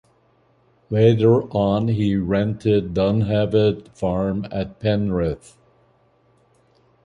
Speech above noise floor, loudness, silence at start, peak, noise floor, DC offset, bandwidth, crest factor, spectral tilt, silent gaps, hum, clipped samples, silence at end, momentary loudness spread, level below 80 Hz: 40 dB; -20 LUFS; 0.9 s; -2 dBFS; -60 dBFS; under 0.1%; 10 kHz; 18 dB; -8.5 dB/octave; none; none; under 0.1%; 1.7 s; 9 LU; -44 dBFS